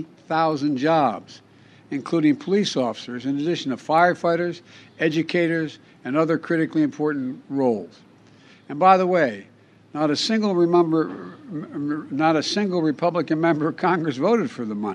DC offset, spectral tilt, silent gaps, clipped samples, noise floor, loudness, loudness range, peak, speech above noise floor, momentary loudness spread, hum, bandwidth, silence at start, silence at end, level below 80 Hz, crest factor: under 0.1%; -6 dB/octave; none; under 0.1%; -51 dBFS; -22 LUFS; 3 LU; -2 dBFS; 29 dB; 13 LU; none; 10 kHz; 0 s; 0 s; -74 dBFS; 20 dB